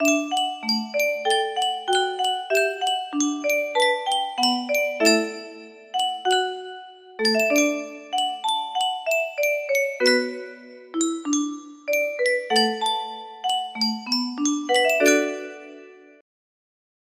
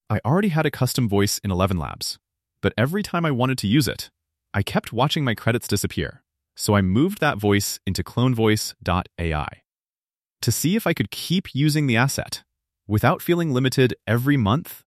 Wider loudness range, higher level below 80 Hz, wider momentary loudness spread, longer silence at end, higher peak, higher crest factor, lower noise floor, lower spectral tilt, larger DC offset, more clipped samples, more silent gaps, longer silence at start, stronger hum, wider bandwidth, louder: about the same, 2 LU vs 2 LU; second, -74 dBFS vs -46 dBFS; first, 14 LU vs 8 LU; first, 1.25 s vs 0.1 s; about the same, -4 dBFS vs -4 dBFS; about the same, 20 dB vs 18 dB; second, -45 dBFS vs under -90 dBFS; second, -1.5 dB/octave vs -5.5 dB/octave; neither; neither; second, none vs 9.68-9.72 s, 9.97-10.10 s; about the same, 0 s vs 0.1 s; neither; about the same, 16 kHz vs 15 kHz; about the same, -22 LUFS vs -22 LUFS